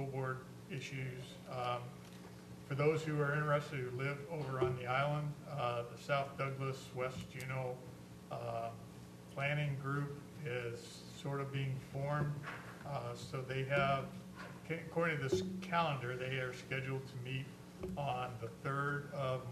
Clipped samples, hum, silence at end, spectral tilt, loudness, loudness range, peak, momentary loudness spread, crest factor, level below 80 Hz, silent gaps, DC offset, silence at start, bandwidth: under 0.1%; none; 0 s; -6 dB/octave; -40 LUFS; 4 LU; -20 dBFS; 13 LU; 20 dB; -66 dBFS; none; under 0.1%; 0 s; 13.5 kHz